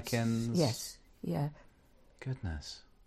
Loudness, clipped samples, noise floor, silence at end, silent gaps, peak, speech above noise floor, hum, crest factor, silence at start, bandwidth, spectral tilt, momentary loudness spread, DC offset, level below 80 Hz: -36 LUFS; under 0.1%; -63 dBFS; 0.25 s; none; -16 dBFS; 28 dB; none; 20 dB; 0 s; 14.5 kHz; -5.5 dB/octave; 13 LU; under 0.1%; -54 dBFS